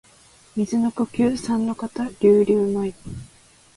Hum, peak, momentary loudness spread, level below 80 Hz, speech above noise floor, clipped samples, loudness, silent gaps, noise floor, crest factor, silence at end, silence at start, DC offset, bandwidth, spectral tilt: none; -6 dBFS; 16 LU; -54 dBFS; 32 dB; under 0.1%; -21 LUFS; none; -52 dBFS; 18 dB; 0.5 s; 0.55 s; under 0.1%; 11.5 kHz; -7 dB/octave